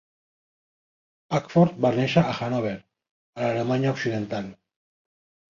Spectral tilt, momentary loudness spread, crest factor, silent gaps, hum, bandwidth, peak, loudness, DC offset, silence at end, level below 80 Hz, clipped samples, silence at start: -7 dB/octave; 12 LU; 20 dB; 3.11-3.33 s; none; 7.4 kHz; -6 dBFS; -24 LUFS; under 0.1%; 0.95 s; -60 dBFS; under 0.1%; 1.3 s